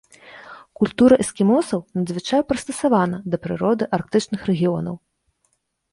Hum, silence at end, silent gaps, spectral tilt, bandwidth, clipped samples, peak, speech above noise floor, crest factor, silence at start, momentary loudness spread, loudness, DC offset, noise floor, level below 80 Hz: none; 0.95 s; none; -6 dB/octave; 11.5 kHz; under 0.1%; -2 dBFS; 50 dB; 18 dB; 0.25 s; 11 LU; -20 LUFS; under 0.1%; -69 dBFS; -54 dBFS